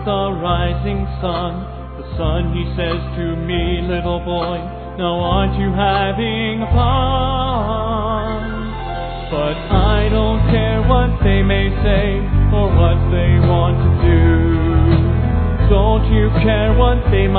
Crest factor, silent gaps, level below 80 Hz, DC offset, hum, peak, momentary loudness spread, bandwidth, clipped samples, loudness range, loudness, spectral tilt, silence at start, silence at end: 14 dB; none; -20 dBFS; under 0.1%; none; 0 dBFS; 9 LU; 4.5 kHz; under 0.1%; 6 LU; -16 LUFS; -11 dB/octave; 0 s; 0 s